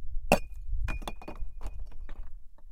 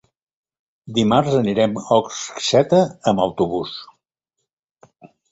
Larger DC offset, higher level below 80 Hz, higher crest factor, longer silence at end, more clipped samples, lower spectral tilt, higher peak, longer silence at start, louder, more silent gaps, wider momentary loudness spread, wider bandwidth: neither; first, -36 dBFS vs -54 dBFS; first, 28 dB vs 20 dB; second, 0 s vs 0.25 s; neither; about the same, -5 dB/octave vs -5.5 dB/octave; about the same, -4 dBFS vs -2 dBFS; second, 0 s vs 0.85 s; second, -34 LUFS vs -19 LUFS; second, none vs 4.53-4.63 s, 4.71-4.76 s; first, 20 LU vs 10 LU; first, 16.5 kHz vs 8.2 kHz